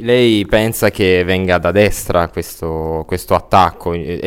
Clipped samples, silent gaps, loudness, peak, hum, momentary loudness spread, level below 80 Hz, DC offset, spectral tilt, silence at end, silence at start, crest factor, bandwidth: under 0.1%; none; -14 LUFS; 0 dBFS; none; 10 LU; -32 dBFS; under 0.1%; -5.5 dB/octave; 0 s; 0 s; 14 dB; 16.5 kHz